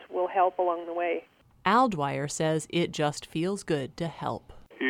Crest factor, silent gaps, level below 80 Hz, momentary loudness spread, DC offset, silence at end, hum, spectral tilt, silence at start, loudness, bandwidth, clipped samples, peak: 18 dB; none; -60 dBFS; 11 LU; under 0.1%; 0 s; none; -5 dB/octave; 0 s; -28 LUFS; 16 kHz; under 0.1%; -10 dBFS